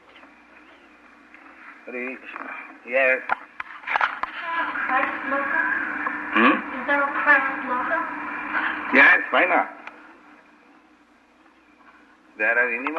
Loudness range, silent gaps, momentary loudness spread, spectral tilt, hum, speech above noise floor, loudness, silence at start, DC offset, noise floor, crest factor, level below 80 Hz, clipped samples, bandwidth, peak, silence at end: 8 LU; none; 17 LU; -4.5 dB/octave; none; 33 dB; -21 LUFS; 0.15 s; under 0.1%; -56 dBFS; 20 dB; -66 dBFS; under 0.1%; 8.6 kHz; -4 dBFS; 0 s